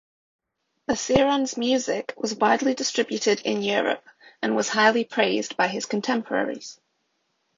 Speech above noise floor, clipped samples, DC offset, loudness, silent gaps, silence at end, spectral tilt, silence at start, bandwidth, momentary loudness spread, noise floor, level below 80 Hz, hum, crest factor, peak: 50 dB; under 0.1%; under 0.1%; -23 LUFS; none; 0.85 s; -3 dB/octave; 0.9 s; 7.6 kHz; 10 LU; -73 dBFS; -60 dBFS; none; 22 dB; -4 dBFS